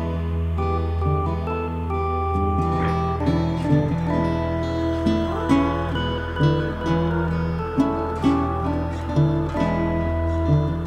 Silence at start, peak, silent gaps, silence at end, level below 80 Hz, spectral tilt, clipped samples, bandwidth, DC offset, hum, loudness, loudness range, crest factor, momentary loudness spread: 0 s; -4 dBFS; none; 0 s; -32 dBFS; -8.5 dB/octave; under 0.1%; 8.8 kHz; under 0.1%; none; -23 LUFS; 1 LU; 16 dB; 4 LU